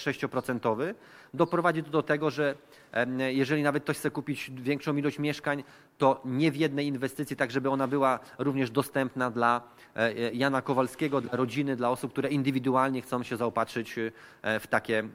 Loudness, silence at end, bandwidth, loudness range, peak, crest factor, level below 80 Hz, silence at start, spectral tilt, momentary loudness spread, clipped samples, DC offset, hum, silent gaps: -29 LUFS; 0 s; 16 kHz; 1 LU; -10 dBFS; 20 dB; -70 dBFS; 0 s; -6 dB/octave; 7 LU; under 0.1%; under 0.1%; none; none